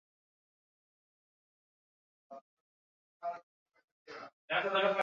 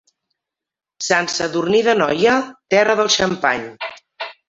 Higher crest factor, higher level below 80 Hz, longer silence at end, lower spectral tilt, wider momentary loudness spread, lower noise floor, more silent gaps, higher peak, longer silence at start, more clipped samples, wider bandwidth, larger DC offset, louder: about the same, 22 dB vs 18 dB; second, under -90 dBFS vs -56 dBFS; second, 0 s vs 0.15 s; second, -0.5 dB/octave vs -3 dB/octave; first, 25 LU vs 15 LU; about the same, under -90 dBFS vs -87 dBFS; first, 2.41-3.20 s, 3.43-3.66 s, 3.84-4.06 s, 4.33-4.48 s vs none; second, -18 dBFS vs -2 dBFS; first, 2.3 s vs 1 s; neither; second, 7.2 kHz vs 8 kHz; neither; second, -35 LUFS vs -17 LUFS